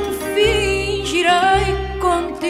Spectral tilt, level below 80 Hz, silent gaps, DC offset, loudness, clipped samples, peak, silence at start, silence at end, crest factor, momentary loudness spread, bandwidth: -4 dB/octave; -30 dBFS; none; under 0.1%; -17 LUFS; under 0.1%; -2 dBFS; 0 s; 0 s; 16 dB; 6 LU; 16 kHz